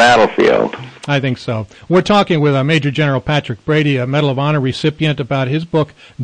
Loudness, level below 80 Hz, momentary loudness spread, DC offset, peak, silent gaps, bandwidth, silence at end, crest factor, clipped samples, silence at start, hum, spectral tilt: -15 LUFS; -46 dBFS; 8 LU; under 0.1%; -2 dBFS; none; 9.8 kHz; 0 s; 12 dB; under 0.1%; 0 s; none; -6.5 dB/octave